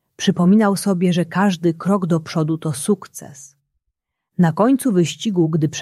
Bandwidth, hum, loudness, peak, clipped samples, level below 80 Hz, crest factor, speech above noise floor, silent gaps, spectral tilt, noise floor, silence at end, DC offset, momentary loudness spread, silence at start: 13.5 kHz; none; -18 LUFS; -2 dBFS; under 0.1%; -62 dBFS; 16 dB; 60 dB; none; -6 dB/octave; -77 dBFS; 0 s; under 0.1%; 8 LU; 0.2 s